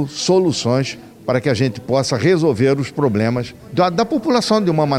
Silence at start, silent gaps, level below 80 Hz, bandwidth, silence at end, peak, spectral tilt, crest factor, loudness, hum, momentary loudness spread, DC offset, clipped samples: 0 s; none; -52 dBFS; 15.5 kHz; 0 s; -4 dBFS; -5.5 dB/octave; 14 dB; -17 LUFS; none; 6 LU; under 0.1%; under 0.1%